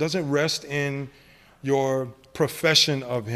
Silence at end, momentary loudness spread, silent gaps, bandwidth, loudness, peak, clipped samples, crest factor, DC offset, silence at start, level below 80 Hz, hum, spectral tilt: 0 s; 16 LU; none; 15.5 kHz; -23 LUFS; -6 dBFS; under 0.1%; 20 dB; under 0.1%; 0 s; -60 dBFS; none; -4 dB/octave